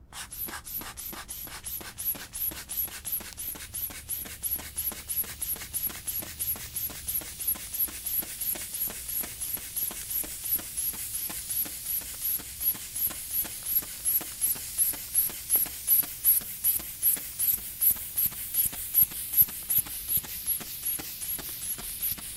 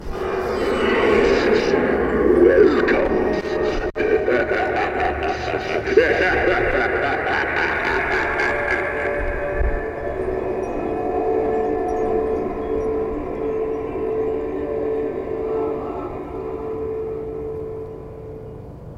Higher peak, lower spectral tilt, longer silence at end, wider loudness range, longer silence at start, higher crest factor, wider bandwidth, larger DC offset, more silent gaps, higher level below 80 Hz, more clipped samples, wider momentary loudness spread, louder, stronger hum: second, -8 dBFS vs -2 dBFS; second, -0.5 dB/octave vs -6.5 dB/octave; about the same, 0 s vs 0 s; about the same, 8 LU vs 9 LU; about the same, 0 s vs 0 s; about the same, 22 dB vs 18 dB; first, 16 kHz vs 9.4 kHz; neither; neither; second, -54 dBFS vs -34 dBFS; neither; about the same, 11 LU vs 12 LU; second, -28 LUFS vs -20 LUFS; neither